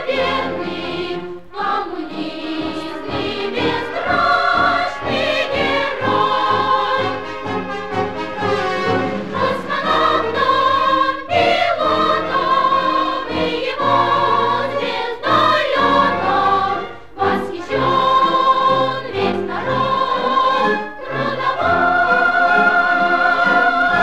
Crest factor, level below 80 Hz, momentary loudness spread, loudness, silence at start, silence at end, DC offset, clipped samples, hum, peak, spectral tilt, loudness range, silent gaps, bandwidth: 14 dB; -48 dBFS; 10 LU; -17 LUFS; 0 s; 0 s; 1%; under 0.1%; none; -2 dBFS; -5 dB/octave; 4 LU; none; 12 kHz